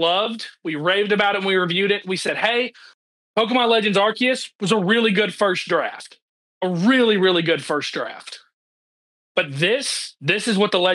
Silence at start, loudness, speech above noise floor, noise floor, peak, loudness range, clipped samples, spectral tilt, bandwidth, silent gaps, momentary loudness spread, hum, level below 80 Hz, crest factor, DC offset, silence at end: 0 s; -20 LUFS; over 70 dB; under -90 dBFS; -4 dBFS; 3 LU; under 0.1%; -4 dB/octave; 12.5 kHz; 2.94-3.34 s, 4.55-4.59 s, 6.22-6.61 s, 8.53-9.35 s; 11 LU; none; -86 dBFS; 16 dB; under 0.1%; 0 s